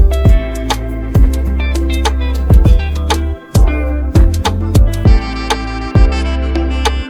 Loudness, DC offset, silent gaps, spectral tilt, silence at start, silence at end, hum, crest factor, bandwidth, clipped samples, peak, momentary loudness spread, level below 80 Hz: -14 LUFS; under 0.1%; none; -6 dB/octave; 0 s; 0 s; none; 10 dB; 14.5 kHz; under 0.1%; 0 dBFS; 7 LU; -12 dBFS